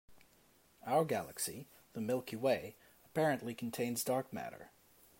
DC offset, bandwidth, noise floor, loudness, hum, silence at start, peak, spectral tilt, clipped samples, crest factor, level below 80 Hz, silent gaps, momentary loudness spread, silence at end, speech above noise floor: under 0.1%; 16 kHz; -69 dBFS; -37 LUFS; none; 0.1 s; -20 dBFS; -4.5 dB/octave; under 0.1%; 18 dB; -76 dBFS; none; 16 LU; 0.55 s; 32 dB